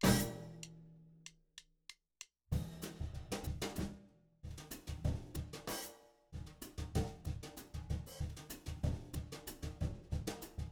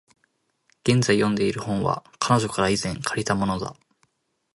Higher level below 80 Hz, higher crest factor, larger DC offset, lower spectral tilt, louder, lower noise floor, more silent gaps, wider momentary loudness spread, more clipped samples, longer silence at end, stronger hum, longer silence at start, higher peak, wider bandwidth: about the same, -50 dBFS vs -52 dBFS; first, 26 dB vs 20 dB; neither; about the same, -5 dB/octave vs -5 dB/octave; second, -44 LUFS vs -23 LUFS; second, -63 dBFS vs -70 dBFS; neither; first, 16 LU vs 7 LU; neither; second, 0 s vs 0.85 s; neither; second, 0 s vs 0.85 s; second, -18 dBFS vs -4 dBFS; first, over 20 kHz vs 11.5 kHz